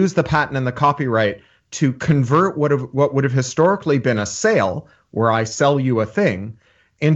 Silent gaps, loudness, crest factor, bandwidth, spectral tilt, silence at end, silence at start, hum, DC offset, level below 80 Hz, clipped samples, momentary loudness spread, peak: none; -18 LUFS; 16 dB; 8.2 kHz; -6 dB/octave; 0 s; 0 s; none; under 0.1%; -50 dBFS; under 0.1%; 6 LU; -2 dBFS